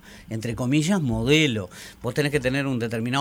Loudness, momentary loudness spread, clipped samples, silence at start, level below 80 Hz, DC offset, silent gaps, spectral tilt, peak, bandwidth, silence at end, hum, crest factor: -23 LUFS; 13 LU; under 0.1%; 0.05 s; -46 dBFS; under 0.1%; none; -5.5 dB/octave; -6 dBFS; 16.5 kHz; 0 s; none; 18 dB